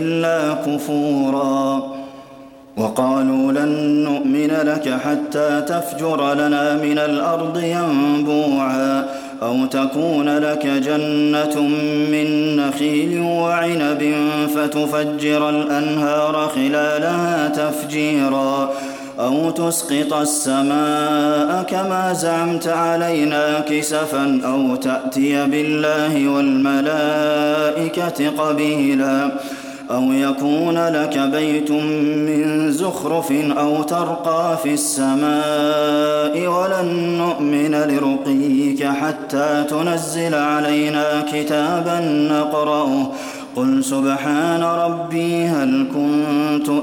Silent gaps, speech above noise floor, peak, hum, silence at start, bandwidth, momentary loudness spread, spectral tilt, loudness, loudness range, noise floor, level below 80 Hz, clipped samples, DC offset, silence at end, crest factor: none; 23 dB; -4 dBFS; none; 0 s; 17 kHz; 4 LU; -5 dB/octave; -18 LUFS; 1 LU; -40 dBFS; -64 dBFS; under 0.1%; under 0.1%; 0 s; 14 dB